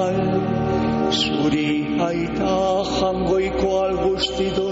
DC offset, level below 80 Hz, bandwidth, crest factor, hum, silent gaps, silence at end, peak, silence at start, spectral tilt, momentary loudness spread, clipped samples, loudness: under 0.1%; -38 dBFS; 8 kHz; 12 dB; none; none; 0 s; -8 dBFS; 0 s; -4.5 dB/octave; 2 LU; under 0.1%; -21 LUFS